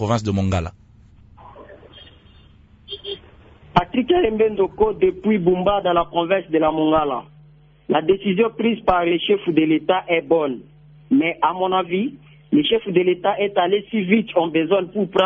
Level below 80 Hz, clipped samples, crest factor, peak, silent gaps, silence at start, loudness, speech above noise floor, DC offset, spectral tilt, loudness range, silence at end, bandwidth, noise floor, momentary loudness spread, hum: -48 dBFS; under 0.1%; 18 dB; -2 dBFS; none; 0 s; -19 LUFS; 31 dB; under 0.1%; -7 dB/octave; 7 LU; 0 s; 8 kHz; -49 dBFS; 7 LU; none